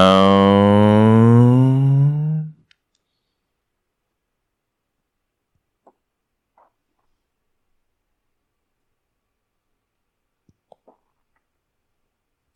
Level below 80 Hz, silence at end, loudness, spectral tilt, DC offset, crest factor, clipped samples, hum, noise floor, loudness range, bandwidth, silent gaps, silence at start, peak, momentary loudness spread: -60 dBFS; 10.05 s; -14 LUFS; -8.5 dB/octave; under 0.1%; 18 dB; under 0.1%; none; -77 dBFS; 17 LU; 10.5 kHz; none; 0 s; -2 dBFS; 11 LU